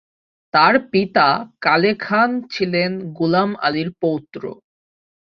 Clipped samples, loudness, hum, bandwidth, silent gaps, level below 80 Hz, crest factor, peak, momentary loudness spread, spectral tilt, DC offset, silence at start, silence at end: under 0.1%; -18 LUFS; none; 6.6 kHz; none; -60 dBFS; 18 dB; -2 dBFS; 9 LU; -7 dB/octave; under 0.1%; 0.55 s; 0.85 s